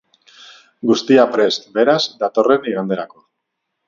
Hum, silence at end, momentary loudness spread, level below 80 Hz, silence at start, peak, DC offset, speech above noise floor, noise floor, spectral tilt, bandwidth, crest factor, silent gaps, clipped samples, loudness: none; 0.8 s; 11 LU; -64 dBFS; 0.85 s; 0 dBFS; under 0.1%; 60 dB; -76 dBFS; -5 dB/octave; 7.4 kHz; 18 dB; none; under 0.1%; -16 LUFS